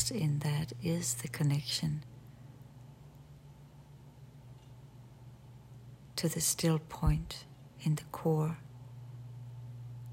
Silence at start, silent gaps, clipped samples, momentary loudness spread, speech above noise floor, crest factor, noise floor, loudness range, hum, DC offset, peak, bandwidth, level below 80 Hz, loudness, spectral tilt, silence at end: 0 s; none; under 0.1%; 23 LU; 22 dB; 20 dB; -55 dBFS; 20 LU; none; under 0.1%; -16 dBFS; 16 kHz; -50 dBFS; -34 LUFS; -5 dB/octave; 0 s